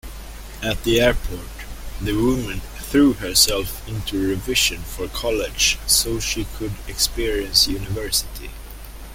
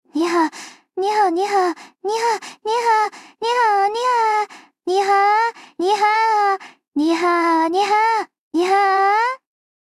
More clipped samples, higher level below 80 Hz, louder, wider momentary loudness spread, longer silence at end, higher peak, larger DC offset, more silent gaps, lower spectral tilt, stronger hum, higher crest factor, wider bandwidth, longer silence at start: neither; first, -32 dBFS vs -76 dBFS; about the same, -20 LUFS vs -18 LUFS; first, 19 LU vs 9 LU; second, 0 s vs 0.45 s; first, -2 dBFS vs -6 dBFS; neither; second, none vs 8.39-8.51 s; about the same, -3 dB/octave vs -2 dB/octave; neither; first, 20 dB vs 12 dB; first, 17 kHz vs 14.5 kHz; about the same, 0.05 s vs 0.15 s